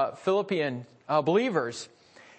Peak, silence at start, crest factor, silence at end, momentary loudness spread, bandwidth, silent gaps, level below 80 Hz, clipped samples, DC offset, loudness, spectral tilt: -12 dBFS; 0 s; 16 dB; 0.55 s; 15 LU; 8.8 kHz; none; -76 dBFS; under 0.1%; under 0.1%; -27 LUFS; -5.5 dB/octave